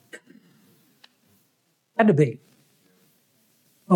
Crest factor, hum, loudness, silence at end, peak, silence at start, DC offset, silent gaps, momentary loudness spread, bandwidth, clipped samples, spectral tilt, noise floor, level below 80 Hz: 20 dB; none; -21 LUFS; 0 s; -6 dBFS; 0.15 s; under 0.1%; none; 27 LU; 15 kHz; under 0.1%; -8.5 dB/octave; -69 dBFS; -82 dBFS